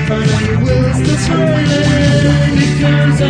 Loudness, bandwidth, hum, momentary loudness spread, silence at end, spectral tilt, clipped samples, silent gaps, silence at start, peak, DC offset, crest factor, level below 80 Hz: -12 LUFS; 10 kHz; none; 3 LU; 0 s; -6 dB/octave; under 0.1%; none; 0 s; 0 dBFS; under 0.1%; 10 dB; -26 dBFS